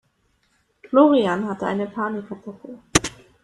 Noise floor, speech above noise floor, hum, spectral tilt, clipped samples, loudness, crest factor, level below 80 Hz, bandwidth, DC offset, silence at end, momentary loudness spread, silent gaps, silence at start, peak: -66 dBFS; 45 dB; none; -4 dB/octave; under 0.1%; -21 LUFS; 22 dB; -50 dBFS; 13 kHz; under 0.1%; 0.35 s; 20 LU; none; 0.9 s; 0 dBFS